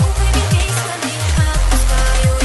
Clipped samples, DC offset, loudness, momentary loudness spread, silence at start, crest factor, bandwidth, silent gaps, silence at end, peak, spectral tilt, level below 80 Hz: under 0.1%; under 0.1%; -16 LUFS; 4 LU; 0 s; 14 dB; 12.5 kHz; none; 0 s; 0 dBFS; -4 dB/octave; -16 dBFS